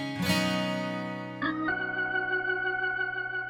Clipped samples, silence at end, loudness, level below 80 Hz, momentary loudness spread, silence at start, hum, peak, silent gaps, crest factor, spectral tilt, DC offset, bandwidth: under 0.1%; 0 s; -29 LUFS; -62 dBFS; 6 LU; 0 s; none; -14 dBFS; none; 16 dB; -4.5 dB/octave; under 0.1%; 17.5 kHz